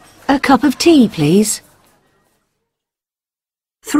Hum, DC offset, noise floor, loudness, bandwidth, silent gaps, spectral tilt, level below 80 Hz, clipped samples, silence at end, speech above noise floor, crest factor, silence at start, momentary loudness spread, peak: none; under 0.1%; under -90 dBFS; -13 LUFS; 16 kHz; none; -4.5 dB/octave; -48 dBFS; under 0.1%; 0 s; over 79 dB; 16 dB; 0.3 s; 9 LU; 0 dBFS